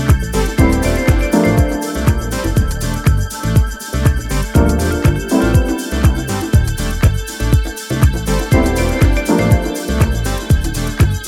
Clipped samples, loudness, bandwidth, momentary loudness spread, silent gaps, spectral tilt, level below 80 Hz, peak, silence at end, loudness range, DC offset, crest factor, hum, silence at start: under 0.1%; -15 LUFS; 17 kHz; 5 LU; none; -6 dB/octave; -18 dBFS; 0 dBFS; 0 s; 1 LU; under 0.1%; 14 dB; none; 0 s